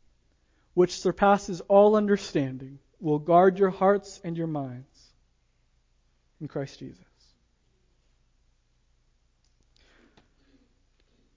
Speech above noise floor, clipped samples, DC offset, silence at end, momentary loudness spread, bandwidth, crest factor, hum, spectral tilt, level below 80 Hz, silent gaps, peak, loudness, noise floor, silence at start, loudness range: 44 dB; under 0.1%; under 0.1%; 4.45 s; 22 LU; 7.6 kHz; 20 dB; none; -6.5 dB/octave; -60 dBFS; none; -8 dBFS; -24 LUFS; -68 dBFS; 0.75 s; 21 LU